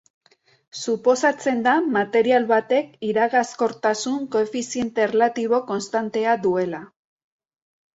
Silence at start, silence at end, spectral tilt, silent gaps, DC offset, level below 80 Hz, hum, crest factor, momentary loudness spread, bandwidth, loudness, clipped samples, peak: 0.75 s; 1.1 s; -4 dB/octave; none; under 0.1%; -68 dBFS; none; 16 dB; 7 LU; 8 kHz; -21 LUFS; under 0.1%; -6 dBFS